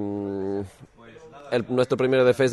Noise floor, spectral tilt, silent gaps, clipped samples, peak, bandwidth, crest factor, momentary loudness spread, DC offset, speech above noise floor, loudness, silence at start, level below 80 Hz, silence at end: -48 dBFS; -6.5 dB/octave; none; under 0.1%; -8 dBFS; 12 kHz; 16 dB; 15 LU; under 0.1%; 27 dB; -24 LUFS; 0 s; -62 dBFS; 0 s